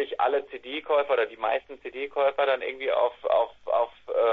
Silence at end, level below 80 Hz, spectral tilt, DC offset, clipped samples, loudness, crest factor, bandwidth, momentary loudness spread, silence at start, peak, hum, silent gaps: 0 s; -68 dBFS; -5 dB/octave; under 0.1%; under 0.1%; -27 LUFS; 14 dB; 4.5 kHz; 8 LU; 0 s; -12 dBFS; none; none